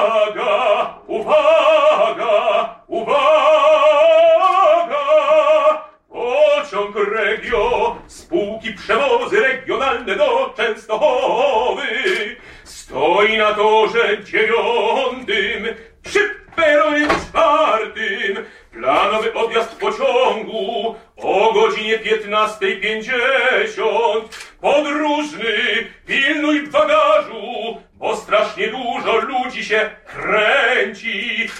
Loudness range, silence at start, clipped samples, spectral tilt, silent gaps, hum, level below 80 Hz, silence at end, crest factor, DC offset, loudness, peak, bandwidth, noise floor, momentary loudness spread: 5 LU; 0 s; under 0.1%; -3.5 dB/octave; none; none; -50 dBFS; 0 s; 14 dB; under 0.1%; -16 LUFS; -4 dBFS; 11 kHz; -38 dBFS; 11 LU